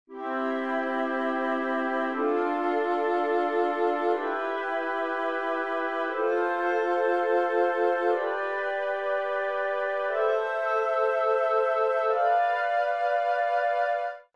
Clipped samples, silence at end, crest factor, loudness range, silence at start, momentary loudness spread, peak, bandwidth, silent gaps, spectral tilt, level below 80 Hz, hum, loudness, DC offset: under 0.1%; 0.15 s; 14 dB; 2 LU; 0.1 s; 4 LU; -14 dBFS; 9.6 kHz; none; -3.5 dB/octave; -82 dBFS; none; -27 LUFS; 0.2%